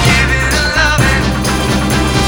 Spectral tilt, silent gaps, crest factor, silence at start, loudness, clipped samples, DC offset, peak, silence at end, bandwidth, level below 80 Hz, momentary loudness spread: -4 dB/octave; none; 12 dB; 0 s; -12 LUFS; under 0.1%; under 0.1%; 0 dBFS; 0 s; over 20 kHz; -20 dBFS; 3 LU